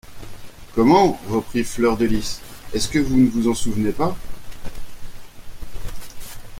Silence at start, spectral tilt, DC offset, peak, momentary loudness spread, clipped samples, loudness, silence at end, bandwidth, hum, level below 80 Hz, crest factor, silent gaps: 0.05 s; -5.5 dB/octave; under 0.1%; -2 dBFS; 24 LU; under 0.1%; -20 LUFS; 0 s; 16.5 kHz; none; -36 dBFS; 18 dB; none